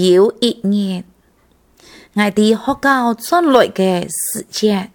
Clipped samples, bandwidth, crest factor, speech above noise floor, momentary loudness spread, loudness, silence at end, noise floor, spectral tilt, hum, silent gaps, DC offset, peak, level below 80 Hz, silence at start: under 0.1%; 19 kHz; 16 dB; 40 dB; 8 LU; -15 LUFS; 0.1 s; -54 dBFS; -4.5 dB/octave; none; none; under 0.1%; 0 dBFS; -54 dBFS; 0 s